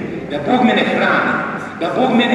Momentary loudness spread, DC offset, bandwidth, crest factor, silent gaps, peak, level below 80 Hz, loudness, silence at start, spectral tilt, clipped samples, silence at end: 9 LU; under 0.1%; 11 kHz; 14 dB; none; -2 dBFS; -54 dBFS; -16 LUFS; 0 s; -6 dB/octave; under 0.1%; 0 s